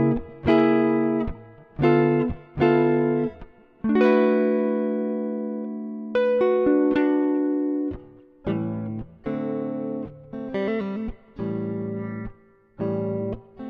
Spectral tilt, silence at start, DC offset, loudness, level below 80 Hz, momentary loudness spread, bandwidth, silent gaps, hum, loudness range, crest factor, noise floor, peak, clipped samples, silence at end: -9.5 dB/octave; 0 s; under 0.1%; -24 LUFS; -46 dBFS; 14 LU; 5.6 kHz; none; none; 8 LU; 16 dB; -51 dBFS; -8 dBFS; under 0.1%; 0 s